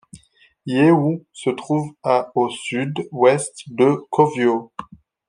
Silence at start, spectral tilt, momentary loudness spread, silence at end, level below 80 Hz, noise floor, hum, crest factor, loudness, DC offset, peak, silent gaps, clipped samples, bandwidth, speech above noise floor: 0.15 s; -6 dB/octave; 10 LU; 0.45 s; -64 dBFS; -54 dBFS; none; 18 dB; -19 LUFS; under 0.1%; -2 dBFS; none; under 0.1%; 10.5 kHz; 36 dB